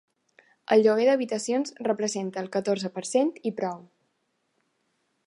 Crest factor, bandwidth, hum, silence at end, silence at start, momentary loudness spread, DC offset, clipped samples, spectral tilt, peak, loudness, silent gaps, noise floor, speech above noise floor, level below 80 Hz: 20 dB; 11.5 kHz; none; 1.45 s; 0.7 s; 11 LU; under 0.1%; under 0.1%; -4.5 dB/octave; -8 dBFS; -26 LUFS; none; -75 dBFS; 50 dB; -82 dBFS